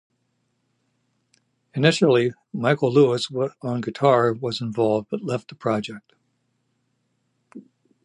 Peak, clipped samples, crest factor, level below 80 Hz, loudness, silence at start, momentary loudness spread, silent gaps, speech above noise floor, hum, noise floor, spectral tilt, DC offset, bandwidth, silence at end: -2 dBFS; under 0.1%; 22 dB; -68 dBFS; -22 LUFS; 1.75 s; 10 LU; none; 50 dB; none; -72 dBFS; -6 dB/octave; under 0.1%; 11 kHz; 0.45 s